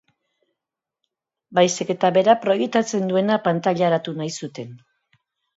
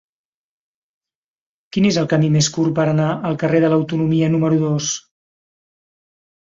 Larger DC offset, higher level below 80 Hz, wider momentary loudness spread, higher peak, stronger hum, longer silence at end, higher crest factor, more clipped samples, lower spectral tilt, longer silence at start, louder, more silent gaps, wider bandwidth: neither; second, -70 dBFS vs -56 dBFS; first, 13 LU vs 5 LU; about the same, -2 dBFS vs -4 dBFS; neither; second, 0.8 s vs 1.5 s; about the same, 20 dB vs 16 dB; neither; about the same, -5 dB/octave vs -5.5 dB/octave; second, 1.5 s vs 1.75 s; second, -20 LUFS vs -17 LUFS; neither; about the same, 8 kHz vs 7.8 kHz